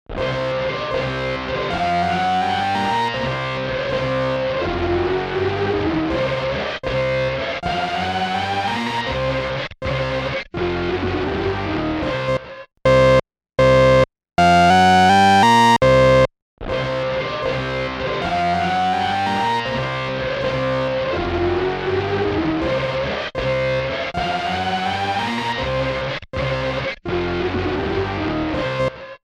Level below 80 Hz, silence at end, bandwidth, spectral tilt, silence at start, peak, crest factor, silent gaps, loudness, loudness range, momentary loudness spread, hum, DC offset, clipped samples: -38 dBFS; 0.1 s; 13 kHz; -5.5 dB/octave; 0.1 s; -8 dBFS; 12 dB; 16.42-16.57 s; -19 LUFS; 8 LU; 10 LU; none; under 0.1%; under 0.1%